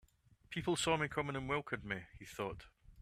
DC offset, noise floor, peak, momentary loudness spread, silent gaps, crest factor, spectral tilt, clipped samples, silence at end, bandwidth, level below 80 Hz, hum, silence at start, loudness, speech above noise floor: under 0.1%; -68 dBFS; -20 dBFS; 11 LU; none; 20 dB; -4 dB/octave; under 0.1%; 0 s; 15.5 kHz; -62 dBFS; none; 0.5 s; -39 LUFS; 29 dB